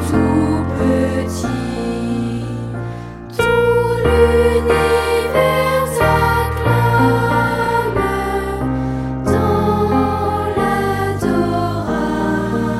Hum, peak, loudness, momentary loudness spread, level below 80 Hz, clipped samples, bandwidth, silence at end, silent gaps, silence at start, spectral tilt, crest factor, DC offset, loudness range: none; -2 dBFS; -16 LUFS; 8 LU; -30 dBFS; under 0.1%; 15.5 kHz; 0 s; none; 0 s; -6.5 dB/octave; 14 dB; under 0.1%; 4 LU